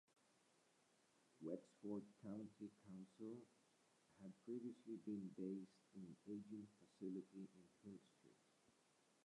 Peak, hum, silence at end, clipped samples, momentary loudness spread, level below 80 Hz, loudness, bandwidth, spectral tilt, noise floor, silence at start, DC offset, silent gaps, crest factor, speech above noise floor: -38 dBFS; none; 0.55 s; under 0.1%; 11 LU; under -90 dBFS; -56 LUFS; 11 kHz; -8 dB/octave; -80 dBFS; 1.35 s; under 0.1%; none; 20 dB; 25 dB